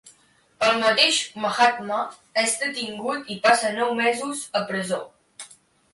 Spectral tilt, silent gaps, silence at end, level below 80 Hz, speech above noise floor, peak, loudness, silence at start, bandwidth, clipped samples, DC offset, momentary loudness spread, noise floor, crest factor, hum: -2 dB/octave; none; 0.45 s; -68 dBFS; 36 dB; -4 dBFS; -22 LUFS; 0.05 s; 11.5 kHz; under 0.1%; under 0.1%; 12 LU; -59 dBFS; 20 dB; none